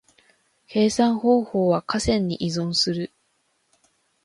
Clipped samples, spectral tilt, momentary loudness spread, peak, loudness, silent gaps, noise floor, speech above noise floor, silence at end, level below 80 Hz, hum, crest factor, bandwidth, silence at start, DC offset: under 0.1%; -5 dB/octave; 7 LU; -6 dBFS; -22 LUFS; none; -69 dBFS; 48 dB; 1.2 s; -48 dBFS; none; 18 dB; 11.5 kHz; 0.7 s; under 0.1%